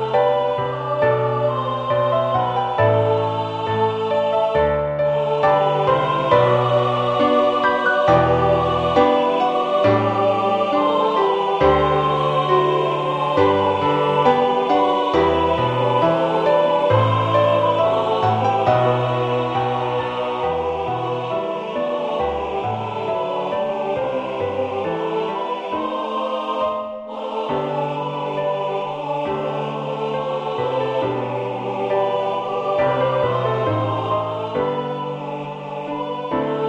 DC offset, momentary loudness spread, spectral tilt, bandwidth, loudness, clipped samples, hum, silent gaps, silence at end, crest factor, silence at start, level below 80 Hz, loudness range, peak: under 0.1%; 8 LU; -7.5 dB/octave; 8.6 kHz; -19 LUFS; under 0.1%; none; none; 0 s; 16 dB; 0 s; -46 dBFS; 7 LU; -2 dBFS